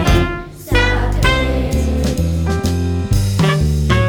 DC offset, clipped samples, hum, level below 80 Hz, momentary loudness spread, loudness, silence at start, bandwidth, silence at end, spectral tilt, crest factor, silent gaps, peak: under 0.1%; under 0.1%; none; -20 dBFS; 4 LU; -16 LUFS; 0 s; over 20 kHz; 0 s; -6 dB/octave; 14 dB; none; 0 dBFS